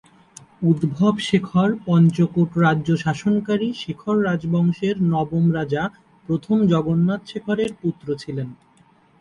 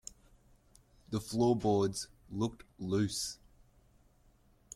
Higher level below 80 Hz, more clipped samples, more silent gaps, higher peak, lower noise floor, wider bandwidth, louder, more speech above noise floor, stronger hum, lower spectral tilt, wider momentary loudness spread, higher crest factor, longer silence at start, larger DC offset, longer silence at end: first, -54 dBFS vs -62 dBFS; neither; neither; first, -6 dBFS vs -18 dBFS; second, -55 dBFS vs -66 dBFS; second, 10.5 kHz vs 15 kHz; first, -21 LUFS vs -34 LUFS; about the same, 35 dB vs 33 dB; neither; first, -7.5 dB/octave vs -5.5 dB/octave; second, 9 LU vs 14 LU; about the same, 16 dB vs 18 dB; second, 0.6 s vs 1.1 s; neither; second, 0.65 s vs 1.4 s